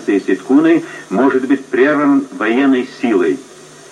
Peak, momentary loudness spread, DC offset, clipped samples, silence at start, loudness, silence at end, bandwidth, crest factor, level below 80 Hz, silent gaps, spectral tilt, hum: 0 dBFS; 5 LU; under 0.1%; under 0.1%; 0 s; -14 LUFS; 0.5 s; 10 kHz; 12 dB; -64 dBFS; none; -6 dB/octave; none